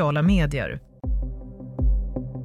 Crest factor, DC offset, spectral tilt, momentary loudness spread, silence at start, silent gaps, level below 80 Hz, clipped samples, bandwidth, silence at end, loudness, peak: 14 dB; under 0.1%; -7.5 dB/octave; 15 LU; 0 s; none; -28 dBFS; under 0.1%; 10.5 kHz; 0 s; -26 LUFS; -10 dBFS